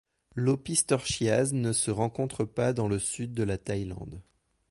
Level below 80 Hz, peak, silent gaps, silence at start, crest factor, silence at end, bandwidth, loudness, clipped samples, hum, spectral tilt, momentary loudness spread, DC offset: -52 dBFS; -10 dBFS; none; 0.35 s; 20 dB; 0.5 s; 11.5 kHz; -29 LUFS; under 0.1%; none; -4.5 dB/octave; 12 LU; under 0.1%